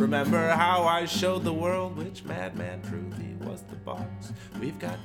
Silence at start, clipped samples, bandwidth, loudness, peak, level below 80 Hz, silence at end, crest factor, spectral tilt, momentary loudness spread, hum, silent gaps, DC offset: 0 s; under 0.1%; 18 kHz; -28 LUFS; -8 dBFS; -60 dBFS; 0 s; 20 dB; -5.5 dB/octave; 16 LU; none; none; under 0.1%